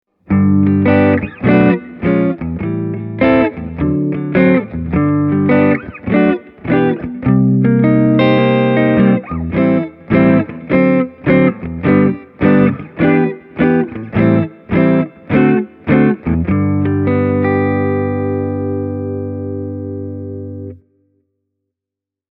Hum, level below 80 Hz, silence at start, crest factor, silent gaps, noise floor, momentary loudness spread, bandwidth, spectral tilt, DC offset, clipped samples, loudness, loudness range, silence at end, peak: 50 Hz at -45 dBFS; -38 dBFS; 0.3 s; 14 dB; none; -85 dBFS; 10 LU; 5.2 kHz; -11.5 dB/octave; under 0.1%; under 0.1%; -14 LUFS; 6 LU; 1.55 s; 0 dBFS